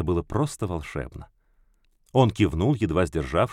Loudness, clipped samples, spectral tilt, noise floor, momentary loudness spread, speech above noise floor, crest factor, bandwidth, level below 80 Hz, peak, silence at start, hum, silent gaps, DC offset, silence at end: -25 LUFS; under 0.1%; -7 dB/octave; -63 dBFS; 13 LU; 39 dB; 18 dB; 14 kHz; -40 dBFS; -6 dBFS; 0 s; none; none; under 0.1%; 0 s